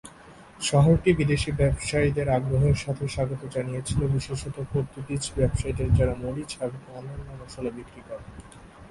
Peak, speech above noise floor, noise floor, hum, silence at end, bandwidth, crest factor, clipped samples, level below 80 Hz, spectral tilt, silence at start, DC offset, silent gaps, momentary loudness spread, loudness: -8 dBFS; 23 dB; -49 dBFS; none; 0 s; 11.5 kHz; 18 dB; under 0.1%; -38 dBFS; -6 dB/octave; 0.05 s; under 0.1%; none; 19 LU; -26 LUFS